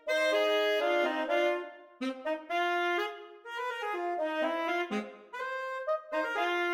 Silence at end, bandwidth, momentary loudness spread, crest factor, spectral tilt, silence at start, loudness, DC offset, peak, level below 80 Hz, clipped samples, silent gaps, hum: 0 s; 17 kHz; 11 LU; 16 dB; -3 dB/octave; 0.05 s; -31 LUFS; under 0.1%; -16 dBFS; -84 dBFS; under 0.1%; none; none